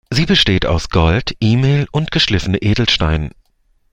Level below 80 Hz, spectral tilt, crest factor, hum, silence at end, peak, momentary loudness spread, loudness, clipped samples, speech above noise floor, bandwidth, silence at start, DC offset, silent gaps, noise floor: -28 dBFS; -5.5 dB/octave; 16 dB; none; 0.65 s; 0 dBFS; 5 LU; -15 LUFS; under 0.1%; 44 dB; 11.5 kHz; 0.1 s; under 0.1%; none; -58 dBFS